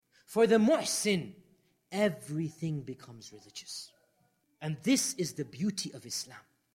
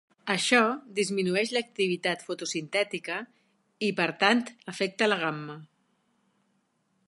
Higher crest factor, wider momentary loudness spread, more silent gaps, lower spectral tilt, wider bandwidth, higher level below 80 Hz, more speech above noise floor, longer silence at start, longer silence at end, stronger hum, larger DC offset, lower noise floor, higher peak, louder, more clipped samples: about the same, 18 dB vs 22 dB; first, 20 LU vs 12 LU; neither; about the same, -4 dB/octave vs -3.5 dB/octave; first, 16.5 kHz vs 11.5 kHz; first, -74 dBFS vs -80 dBFS; second, 41 dB vs 45 dB; about the same, 0.3 s vs 0.25 s; second, 0.35 s vs 1.4 s; neither; neither; about the same, -73 dBFS vs -73 dBFS; second, -14 dBFS vs -6 dBFS; second, -31 LUFS vs -27 LUFS; neither